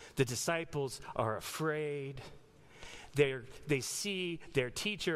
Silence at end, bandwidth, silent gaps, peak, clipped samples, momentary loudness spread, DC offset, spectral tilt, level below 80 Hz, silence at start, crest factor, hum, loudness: 0 s; 15.5 kHz; none; -16 dBFS; under 0.1%; 15 LU; under 0.1%; -4 dB/octave; -62 dBFS; 0 s; 22 dB; none; -36 LUFS